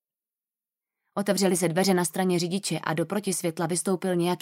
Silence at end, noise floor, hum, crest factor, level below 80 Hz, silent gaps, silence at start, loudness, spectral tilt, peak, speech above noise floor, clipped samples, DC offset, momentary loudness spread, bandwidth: 0.05 s; under -90 dBFS; none; 16 dB; -74 dBFS; none; 1.15 s; -26 LUFS; -4.5 dB/octave; -10 dBFS; over 64 dB; under 0.1%; under 0.1%; 5 LU; 16 kHz